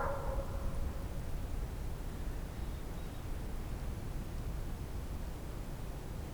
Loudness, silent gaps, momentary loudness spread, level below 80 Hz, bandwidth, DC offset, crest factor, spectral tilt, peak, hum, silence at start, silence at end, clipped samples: -43 LUFS; none; 4 LU; -40 dBFS; over 20 kHz; under 0.1%; 14 dB; -6.5 dB/octave; -24 dBFS; none; 0 s; 0 s; under 0.1%